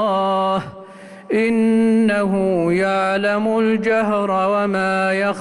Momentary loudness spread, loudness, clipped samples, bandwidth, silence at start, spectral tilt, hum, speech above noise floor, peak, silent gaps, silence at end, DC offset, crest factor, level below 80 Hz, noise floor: 4 LU; -18 LUFS; under 0.1%; 11.5 kHz; 0 s; -6.5 dB/octave; none; 21 dB; -8 dBFS; none; 0 s; under 0.1%; 10 dB; -54 dBFS; -38 dBFS